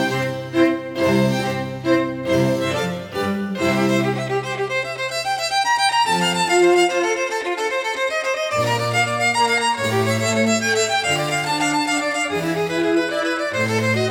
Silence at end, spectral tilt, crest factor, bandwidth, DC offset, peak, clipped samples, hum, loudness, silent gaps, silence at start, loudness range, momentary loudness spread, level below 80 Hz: 0 s; -4 dB/octave; 16 dB; 18.5 kHz; under 0.1%; -4 dBFS; under 0.1%; none; -19 LUFS; none; 0 s; 3 LU; 6 LU; -58 dBFS